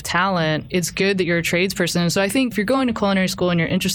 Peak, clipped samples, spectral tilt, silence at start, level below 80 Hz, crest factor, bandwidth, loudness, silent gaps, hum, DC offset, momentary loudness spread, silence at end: -6 dBFS; under 0.1%; -4.5 dB/octave; 0 s; -46 dBFS; 14 dB; 19.5 kHz; -19 LUFS; none; none; under 0.1%; 2 LU; 0 s